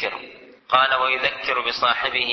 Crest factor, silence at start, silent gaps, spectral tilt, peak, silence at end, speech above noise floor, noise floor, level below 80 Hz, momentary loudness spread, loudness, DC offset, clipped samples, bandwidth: 20 dB; 0 s; none; -2.5 dB/octave; -2 dBFS; 0 s; 22 dB; -43 dBFS; -58 dBFS; 7 LU; -20 LUFS; under 0.1%; under 0.1%; 6.4 kHz